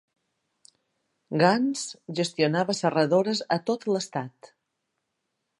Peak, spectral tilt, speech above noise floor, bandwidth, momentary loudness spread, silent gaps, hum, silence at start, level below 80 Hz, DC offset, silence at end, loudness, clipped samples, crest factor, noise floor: -6 dBFS; -5 dB/octave; 55 dB; 11.5 kHz; 11 LU; none; none; 1.3 s; -76 dBFS; under 0.1%; 1.15 s; -25 LUFS; under 0.1%; 22 dB; -80 dBFS